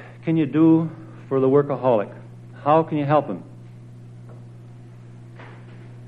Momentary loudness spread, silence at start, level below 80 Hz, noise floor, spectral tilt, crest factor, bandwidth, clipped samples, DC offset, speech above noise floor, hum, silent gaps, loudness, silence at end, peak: 25 LU; 0 s; -62 dBFS; -41 dBFS; -10 dB/octave; 18 dB; 4.4 kHz; under 0.1%; under 0.1%; 23 dB; 60 Hz at -40 dBFS; none; -20 LUFS; 0 s; -4 dBFS